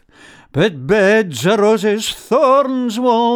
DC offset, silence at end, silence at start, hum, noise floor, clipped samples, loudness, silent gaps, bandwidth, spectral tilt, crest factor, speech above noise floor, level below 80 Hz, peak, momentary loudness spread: under 0.1%; 0 s; 0.55 s; none; -44 dBFS; under 0.1%; -15 LUFS; none; 19 kHz; -5 dB/octave; 14 dB; 30 dB; -50 dBFS; -2 dBFS; 6 LU